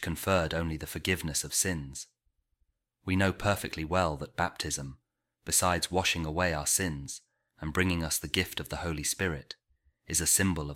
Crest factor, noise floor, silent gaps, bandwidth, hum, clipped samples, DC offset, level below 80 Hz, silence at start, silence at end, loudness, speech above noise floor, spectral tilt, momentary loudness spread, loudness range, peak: 22 dB; -77 dBFS; none; 17 kHz; none; under 0.1%; under 0.1%; -48 dBFS; 0 s; 0 s; -30 LUFS; 46 dB; -3 dB/octave; 16 LU; 3 LU; -10 dBFS